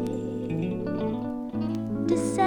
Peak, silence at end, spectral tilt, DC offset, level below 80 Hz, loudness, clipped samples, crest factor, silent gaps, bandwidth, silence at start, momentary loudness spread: -10 dBFS; 0 s; -7 dB/octave; under 0.1%; -52 dBFS; -29 LUFS; under 0.1%; 16 dB; none; 18.5 kHz; 0 s; 6 LU